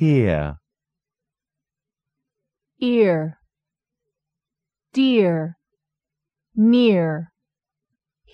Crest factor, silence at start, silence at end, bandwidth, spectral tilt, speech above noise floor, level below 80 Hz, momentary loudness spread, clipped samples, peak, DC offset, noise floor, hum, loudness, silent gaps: 16 dB; 0 s; 1.1 s; 7 kHz; -8.5 dB/octave; 70 dB; -48 dBFS; 15 LU; under 0.1%; -6 dBFS; under 0.1%; -87 dBFS; none; -19 LUFS; none